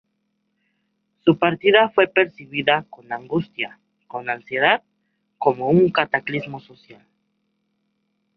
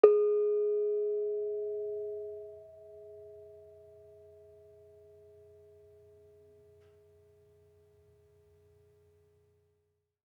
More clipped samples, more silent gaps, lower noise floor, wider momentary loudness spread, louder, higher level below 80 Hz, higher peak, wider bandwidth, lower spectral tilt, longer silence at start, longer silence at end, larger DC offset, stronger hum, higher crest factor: neither; neither; second, -72 dBFS vs -79 dBFS; second, 15 LU vs 28 LU; first, -20 LUFS vs -32 LUFS; first, -64 dBFS vs -84 dBFS; first, -2 dBFS vs -6 dBFS; first, 5.4 kHz vs 3.1 kHz; about the same, -8.5 dB/octave vs -8 dB/octave; first, 1.25 s vs 0.05 s; second, 1.45 s vs 6.7 s; neither; neither; second, 20 dB vs 30 dB